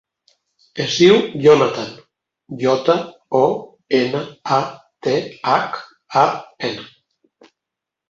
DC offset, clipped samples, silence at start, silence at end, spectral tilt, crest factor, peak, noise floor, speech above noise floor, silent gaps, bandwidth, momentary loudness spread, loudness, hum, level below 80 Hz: under 0.1%; under 0.1%; 0.75 s; 1.25 s; -5 dB/octave; 18 dB; 0 dBFS; -84 dBFS; 67 dB; none; 7.6 kHz; 15 LU; -18 LUFS; none; -60 dBFS